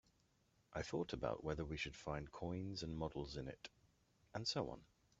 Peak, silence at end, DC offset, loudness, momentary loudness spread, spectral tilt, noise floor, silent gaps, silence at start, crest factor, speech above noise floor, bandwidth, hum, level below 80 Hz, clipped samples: -26 dBFS; 0.35 s; under 0.1%; -46 LUFS; 10 LU; -4.5 dB/octave; -78 dBFS; none; 0.7 s; 22 dB; 32 dB; 8 kHz; none; -62 dBFS; under 0.1%